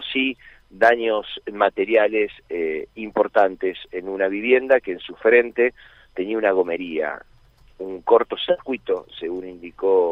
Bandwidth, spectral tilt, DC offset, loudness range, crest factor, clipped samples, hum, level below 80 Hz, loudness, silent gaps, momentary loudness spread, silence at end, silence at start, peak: 5.8 kHz; -6 dB/octave; under 0.1%; 3 LU; 18 dB; under 0.1%; none; -56 dBFS; -21 LUFS; none; 14 LU; 0 s; 0 s; -4 dBFS